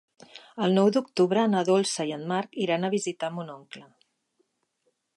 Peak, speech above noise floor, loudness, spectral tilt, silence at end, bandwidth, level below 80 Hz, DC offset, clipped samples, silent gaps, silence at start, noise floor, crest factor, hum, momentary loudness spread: -10 dBFS; 49 dB; -26 LUFS; -5 dB/octave; 1.35 s; 11.5 kHz; -80 dBFS; under 0.1%; under 0.1%; none; 0.35 s; -75 dBFS; 16 dB; none; 19 LU